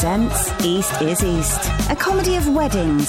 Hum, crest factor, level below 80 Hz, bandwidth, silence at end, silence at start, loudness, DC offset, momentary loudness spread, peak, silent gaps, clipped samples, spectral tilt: none; 12 dB; -28 dBFS; 17 kHz; 0 s; 0 s; -19 LUFS; under 0.1%; 2 LU; -6 dBFS; none; under 0.1%; -4.5 dB/octave